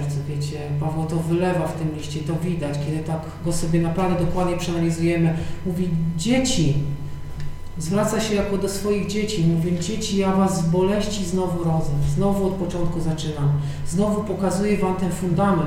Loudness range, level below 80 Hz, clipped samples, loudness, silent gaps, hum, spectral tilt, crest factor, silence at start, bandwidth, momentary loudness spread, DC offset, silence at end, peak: 2 LU; -34 dBFS; under 0.1%; -23 LUFS; none; none; -6 dB/octave; 16 dB; 0 s; 15.5 kHz; 7 LU; under 0.1%; 0 s; -6 dBFS